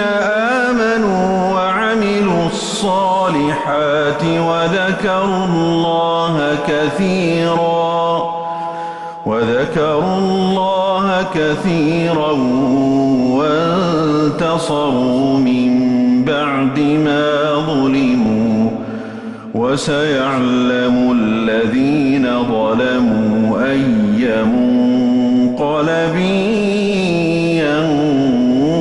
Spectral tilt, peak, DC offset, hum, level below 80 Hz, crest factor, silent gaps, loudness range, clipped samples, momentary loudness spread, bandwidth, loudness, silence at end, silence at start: -6 dB/octave; -4 dBFS; under 0.1%; none; -46 dBFS; 10 dB; none; 2 LU; under 0.1%; 3 LU; 11.5 kHz; -15 LUFS; 0 s; 0 s